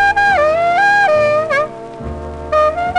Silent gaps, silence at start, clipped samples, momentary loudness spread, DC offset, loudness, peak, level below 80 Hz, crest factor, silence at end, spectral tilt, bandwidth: none; 0 s; under 0.1%; 16 LU; under 0.1%; -13 LUFS; -4 dBFS; -36 dBFS; 10 dB; 0 s; -4.5 dB/octave; 10.5 kHz